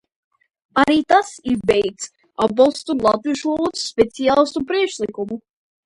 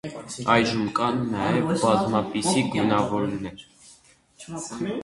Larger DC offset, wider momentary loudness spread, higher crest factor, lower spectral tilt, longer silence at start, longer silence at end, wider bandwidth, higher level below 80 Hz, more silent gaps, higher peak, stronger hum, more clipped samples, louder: neither; second, 10 LU vs 13 LU; about the same, 18 dB vs 22 dB; about the same, -4 dB/octave vs -5 dB/octave; first, 0.75 s vs 0.05 s; first, 0.45 s vs 0 s; about the same, 11.5 kHz vs 11.5 kHz; about the same, -52 dBFS vs -54 dBFS; neither; about the same, 0 dBFS vs -2 dBFS; neither; neither; first, -19 LUFS vs -24 LUFS